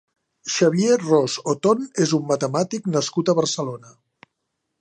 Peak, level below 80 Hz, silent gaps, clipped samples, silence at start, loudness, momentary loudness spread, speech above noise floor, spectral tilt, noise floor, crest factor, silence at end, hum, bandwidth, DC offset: -4 dBFS; -70 dBFS; none; under 0.1%; 0.45 s; -21 LUFS; 9 LU; 57 dB; -5 dB/octave; -77 dBFS; 18 dB; 0.9 s; none; 9.8 kHz; under 0.1%